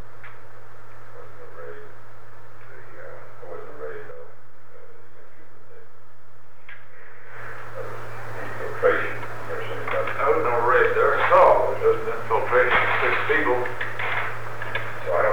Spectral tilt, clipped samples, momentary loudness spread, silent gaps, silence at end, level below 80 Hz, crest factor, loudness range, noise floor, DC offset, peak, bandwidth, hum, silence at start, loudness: -5.5 dB/octave; under 0.1%; 25 LU; none; 0 s; -52 dBFS; 20 dB; 24 LU; -53 dBFS; 6%; -6 dBFS; over 20 kHz; none; 0.15 s; -22 LUFS